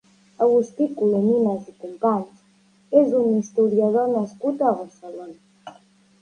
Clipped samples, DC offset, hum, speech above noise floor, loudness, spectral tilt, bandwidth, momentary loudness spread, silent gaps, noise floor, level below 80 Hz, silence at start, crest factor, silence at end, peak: under 0.1%; under 0.1%; none; 37 dB; -21 LUFS; -8.5 dB/octave; 9.6 kHz; 19 LU; none; -58 dBFS; -70 dBFS; 0.4 s; 18 dB; 0.5 s; -4 dBFS